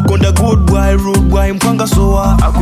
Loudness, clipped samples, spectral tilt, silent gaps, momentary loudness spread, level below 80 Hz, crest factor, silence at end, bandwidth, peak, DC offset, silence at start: -11 LUFS; under 0.1%; -6.5 dB/octave; none; 2 LU; -14 dBFS; 8 dB; 0 s; 16 kHz; 0 dBFS; under 0.1%; 0 s